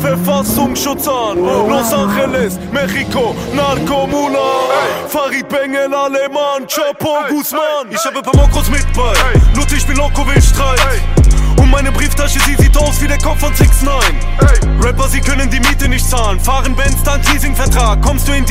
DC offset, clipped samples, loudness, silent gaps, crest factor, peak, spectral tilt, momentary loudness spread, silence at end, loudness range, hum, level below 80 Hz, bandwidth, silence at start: under 0.1%; under 0.1%; -13 LUFS; none; 10 dB; 0 dBFS; -4.5 dB/octave; 5 LU; 0 s; 3 LU; none; -14 dBFS; 16.5 kHz; 0 s